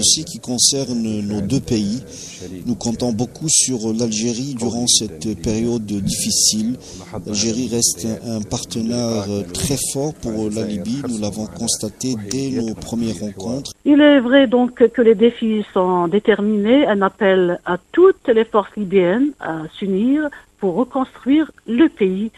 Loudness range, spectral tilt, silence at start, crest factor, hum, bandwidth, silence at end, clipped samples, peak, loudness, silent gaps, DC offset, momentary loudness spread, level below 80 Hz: 7 LU; -4 dB/octave; 0 s; 18 dB; none; 13.5 kHz; 0.1 s; under 0.1%; 0 dBFS; -18 LUFS; none; under 0.1%; 11 LU; -46 dBFS